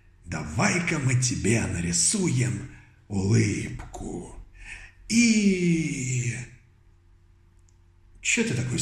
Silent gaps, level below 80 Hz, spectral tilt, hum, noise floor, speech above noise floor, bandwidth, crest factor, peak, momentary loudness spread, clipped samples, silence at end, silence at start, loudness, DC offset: none; -48 dBFS; -4.5 dB/octave; none; -56 dBFS; 32 dB; 13 kHz; 18 dB; -8 dBFS; 21 LU; under 0.1%; 0 s; 0.25 s; -24 LUFS; under 0.1%